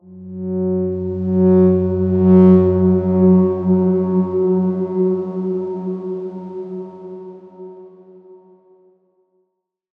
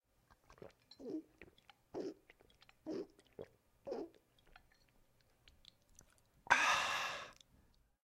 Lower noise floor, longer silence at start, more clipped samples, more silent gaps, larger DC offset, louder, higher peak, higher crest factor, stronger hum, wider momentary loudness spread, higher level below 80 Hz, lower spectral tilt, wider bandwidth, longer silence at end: about the same, -72 dBFS vs -73 dBFS; second, 0.1 s vs 0.5 s; neither; neither; neither; first, -16 LUFS vs -39 LUFS; first, -2 dBFS vs -12 dBFS; second, 16 dB vs 32 dB; neither; second, 22 LU vs 28 LU; first, -64 dBFS vs -74 dBFS; first, -13 dB/octave vs -1.5 dB/octave; second, 2.4 kHz vs 16 kHz; first, 1.65 s vs 0.75 s